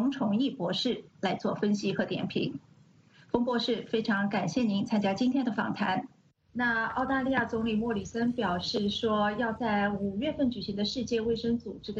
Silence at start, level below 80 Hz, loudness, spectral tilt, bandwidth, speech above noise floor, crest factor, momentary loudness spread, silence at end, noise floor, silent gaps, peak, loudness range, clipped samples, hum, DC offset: 0 s; -58 dBFS; -30 LUFS; -5.5 dB/octave; 8 kHz; 30 dB; 20 dB; 5 LU; 0 s; -59 dBFS; none; -10 dBFS; 2 LU; under 0.1%; none; under 0.1%